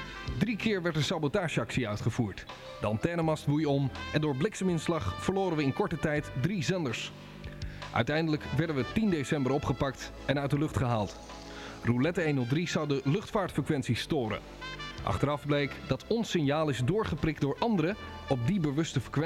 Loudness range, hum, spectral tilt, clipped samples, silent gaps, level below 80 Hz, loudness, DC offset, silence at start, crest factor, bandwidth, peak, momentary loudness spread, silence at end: 2 LU; none; -6 dB/octave; under 0.1%; none; -50 dBFS; -31 LUFS; under 0.1%; 0 s; 18 dB; 14.5 kHz; -12 dBFS; 9 LU; 0 s